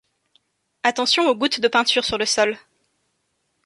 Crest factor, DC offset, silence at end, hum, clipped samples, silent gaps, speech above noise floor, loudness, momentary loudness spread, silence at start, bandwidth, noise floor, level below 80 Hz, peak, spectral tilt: 20 dB; under 0.1%; 1.05 s; none; under 0.1%; none; 52 dB; -19 LUFS; 5 LU; 0.85 s; 11.5 kHz; -71 dBFS; -56 dBFS; -2 dBFS; -1.5 dB/octave